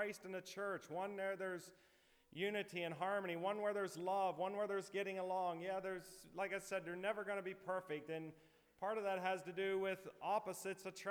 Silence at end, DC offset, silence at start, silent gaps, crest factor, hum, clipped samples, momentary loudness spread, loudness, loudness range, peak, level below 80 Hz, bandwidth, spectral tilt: 0 s; under 0.1%; 0 s; none; 16 dB; none; under 0.1%; 7 LU; -44 LUFS; 3 LU; -28 dBFS; -84 dBFS; over 20 kHz; -4.5 dB/octave